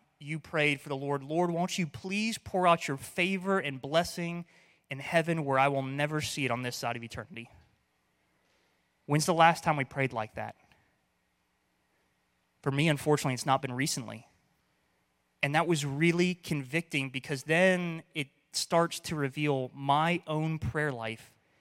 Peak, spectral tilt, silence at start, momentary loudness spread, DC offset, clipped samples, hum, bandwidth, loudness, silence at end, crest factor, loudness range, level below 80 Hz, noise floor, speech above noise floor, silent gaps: -8 dBFS; -5 dB/octave; 0.2 s; 12 LU; under 0.1%; under 0.1%; none; 16.5 kHz; -30 LUFS; 0.35 s; 24 dB; 4 LU; -64 dBFS; -75 dBFS; 45 dB; none